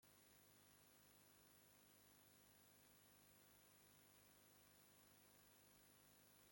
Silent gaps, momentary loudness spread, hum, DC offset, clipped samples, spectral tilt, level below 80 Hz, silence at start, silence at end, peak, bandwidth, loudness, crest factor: none; 0 LU; 50 Hz at -85 dBFS; under 0.1%; under 0.1%; -2.5 dB/octave; under -90 dBFS; 0 s; 0 s; -54 dBFS; 16.5 kHz; -70 LUFS; 18 dB